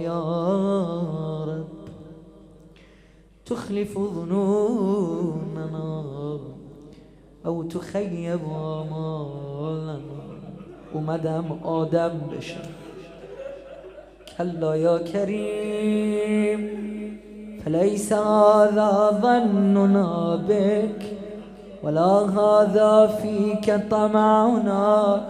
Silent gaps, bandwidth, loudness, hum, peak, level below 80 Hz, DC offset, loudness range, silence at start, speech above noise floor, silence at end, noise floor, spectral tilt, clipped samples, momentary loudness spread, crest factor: none; 12.5 kHz; -22 LUFS; none; -4 dBFS; -56 dBFS; under 0.1%; 12 LU; 0 s; 31 dB; 0 s; -52 dBFS; -7.5 dB/octave; under 0.1%; 20 LU; 20 dB